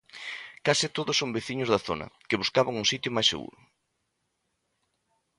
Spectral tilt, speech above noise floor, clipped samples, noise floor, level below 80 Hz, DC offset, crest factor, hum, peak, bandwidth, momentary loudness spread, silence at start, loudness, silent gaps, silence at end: -3 dB/octave; 50 dB; under 0.1%; -78 dBFS; -62 dBFS; under 0.1%; 22 dB; none; -8 dBFS; 11.5 kHz; 13 LU; 0.15 s; -27 LUFS; none; 1.9 s